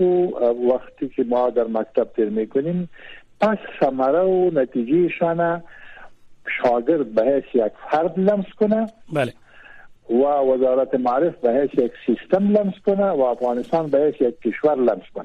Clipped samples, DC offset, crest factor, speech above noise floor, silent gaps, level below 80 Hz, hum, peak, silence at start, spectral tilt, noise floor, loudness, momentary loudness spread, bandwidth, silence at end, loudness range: under 0.1%; under 0.1%; 14 dB; 24 dB; none; -56 dBFS; none; -6 dBFS; 0 s; -8.5 dB/octave; -44 dBFS; -20 LUFS; 6 LU; 9 kHz; 0 s; 2 LU